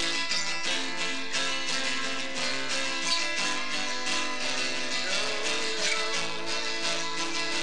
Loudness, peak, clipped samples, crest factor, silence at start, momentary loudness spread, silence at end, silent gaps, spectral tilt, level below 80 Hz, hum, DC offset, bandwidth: -28 LUFS; -14 dBFS; under 0.1%; 18 dB; 0 s; 3 LU; 0 s; none; -0.5 dB/octave; -66 dBFS; none; 3%; 10.5 kHz